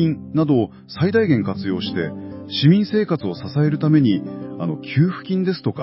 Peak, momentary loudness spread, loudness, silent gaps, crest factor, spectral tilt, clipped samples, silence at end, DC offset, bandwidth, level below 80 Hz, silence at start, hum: -2 dBFS; 11 LU; -20 LUFS; none; 16 dB; -11.5 dB/octave; under 0.1%; 0 s; under 0.1%; 5.8 kHz; -52 dBFS; 0 s; none